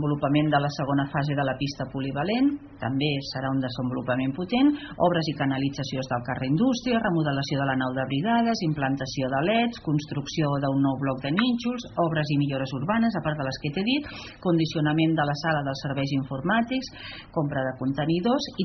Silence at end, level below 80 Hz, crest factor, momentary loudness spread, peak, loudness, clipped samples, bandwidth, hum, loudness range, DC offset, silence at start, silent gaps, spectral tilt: 0 s; -54 dBFS; 18 dB; 6 LU; -8 dBFS; -26 LUFS; under 0.1%; 6.4 kHz; none; 2 LU; under 0.1%; 0 s; none; -5 dB/octave